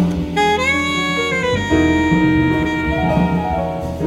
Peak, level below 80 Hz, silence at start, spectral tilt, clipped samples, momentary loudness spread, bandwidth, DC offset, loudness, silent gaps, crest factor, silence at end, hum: -2 dBFS; -32 dBFS; 0 s; -6 dB/octave; under 0.1%; 4 LU; 14.5 kHz; under 0.1%; -16 LUFS; none; 14 dB; 0 s; none